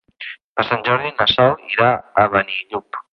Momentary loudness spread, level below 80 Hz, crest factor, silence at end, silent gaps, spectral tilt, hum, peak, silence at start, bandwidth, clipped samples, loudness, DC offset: 13 LU; -50 dBFS; 18 dB; 0.1 s; 0.41-0.55 s; -6.5 dB/octave; none; -2 dBFS; 0.2 s; 6 kHz; under 0.1%; -17 LUFS; under 0.1%